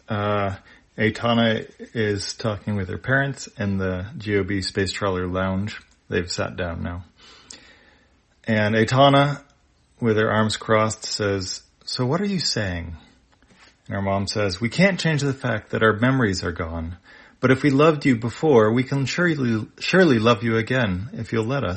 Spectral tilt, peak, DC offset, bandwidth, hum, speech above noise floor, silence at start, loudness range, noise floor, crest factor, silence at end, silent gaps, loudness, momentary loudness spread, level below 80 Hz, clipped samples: -5.5 dB/octave; -2 dBFS; under 0.1%; 8.8 kHz; none; 38 dB; 0.1 s; 6 LU; -59 dBFS; 20 dB; 0 s; none; -22 LUFS; 13 LU; -52 dBFS; under 0.1%